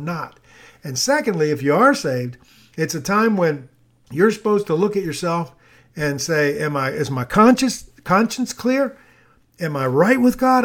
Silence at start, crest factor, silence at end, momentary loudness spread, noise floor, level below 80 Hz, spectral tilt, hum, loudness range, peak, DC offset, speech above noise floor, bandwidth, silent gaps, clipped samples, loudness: 0 s; 18 dB; 0 s; 14 LU; -54 dBFS; -52 dBFS; -5 dB/octave; none; 2 LU; 0 dBFS; under 0.1%; 36 dB; 18.5 kHz; none; under 0.1%; -19 LUFS